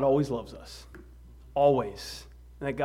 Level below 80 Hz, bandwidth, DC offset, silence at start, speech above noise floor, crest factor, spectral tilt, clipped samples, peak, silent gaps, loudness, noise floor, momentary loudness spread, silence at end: -50 dBFS; 15.5 kHz; under 0.1%; 0 s; 23 dB; 20 dB; -6.5 dB/octave; under 0.1%; -10 dBFS; none; -28 LUFS; -50 dBFS; 21 LU; 0 s